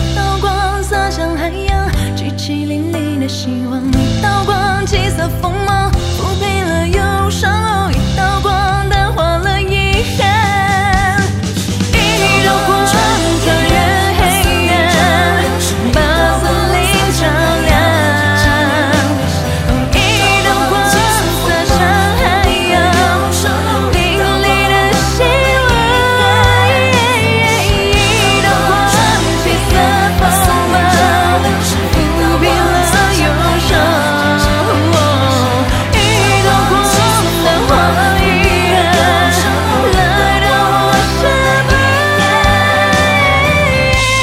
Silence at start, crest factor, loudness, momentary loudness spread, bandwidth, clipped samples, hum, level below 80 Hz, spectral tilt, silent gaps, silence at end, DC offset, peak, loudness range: 0 s; 12 dB; -11 LUFS; 5 LU; 16.5 kHz; under 0.1%; none; -22 dBFS; -4.5 dB/octave; none; 0 s; under 0.1%; 0 dBFS; 4 LU